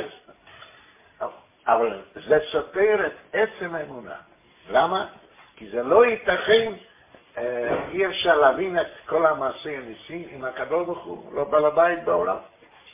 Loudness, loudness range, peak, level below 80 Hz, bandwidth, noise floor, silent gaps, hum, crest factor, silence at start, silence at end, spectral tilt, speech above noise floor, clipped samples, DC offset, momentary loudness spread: -23 LUFS; 3 LU; -4 dBFS; -58 dBFS; 3.8 kHz; -53 dBFS; none; none; 20 dB; 0 s; 0.45 s; -8 dB/octave; 31 dB; under 0.1%; under 0.1%; 17 LU